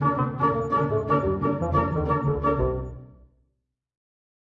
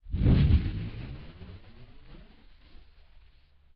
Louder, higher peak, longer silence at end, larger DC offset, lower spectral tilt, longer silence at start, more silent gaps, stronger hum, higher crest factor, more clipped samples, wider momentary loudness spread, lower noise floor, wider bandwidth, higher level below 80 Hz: about the same, -24 LUFS vs -26 LUFS; about the same, -10 dBFS vs -12 dBFS; second, 1.4 s vs 1.6 s; neither; first, -10 dB/octave vs -8.5 dB/octave; about the same, 0 s vs 0.05 s; neither; neither; about the same, 16 dB vs 18 dB; neither; second, 5 LU vs 25 LU; first, -76 dBFS vs -58 dBFS; first, 7.2 kHz vs 5.2 kHz; second, -40 dBFS vs -34 dBFS